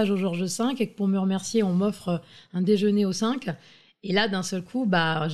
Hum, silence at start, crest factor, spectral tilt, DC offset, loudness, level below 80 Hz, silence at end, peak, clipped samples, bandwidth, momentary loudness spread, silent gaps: none; 0 s; 16 dB; -5.5 dB/octave; 0.2%; -25 LUFS; -64 dBFS; 0 s; -10 dBFS; under 0.1%; 13 kHz; 9 LU; none